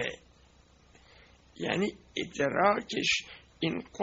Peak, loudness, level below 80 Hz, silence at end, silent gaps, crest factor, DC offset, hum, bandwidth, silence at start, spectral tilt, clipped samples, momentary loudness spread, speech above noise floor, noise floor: -10 dBFS; -30 LUFS; -62 dBFS; 0 s; none; 22 dB; under 0.1%; 60 Hz at -65 dBFS; 7.8 kHz; 0 s; -2.5 dB/octave; under 0.1%; 11 LU; 30 dB; -61 dBFS